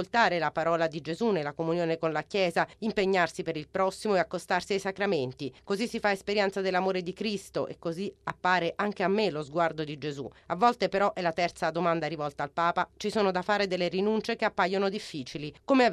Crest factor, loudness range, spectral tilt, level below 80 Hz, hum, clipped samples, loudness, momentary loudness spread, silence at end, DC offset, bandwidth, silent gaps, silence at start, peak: 18 dB; 2 LU; -5 dB/octave; -62 dBFS; none; under 0.1%; -29 LUFS; 9 LU; 0 s; under 0.1%; 13 kHz; none; 0 s; -10 dBFS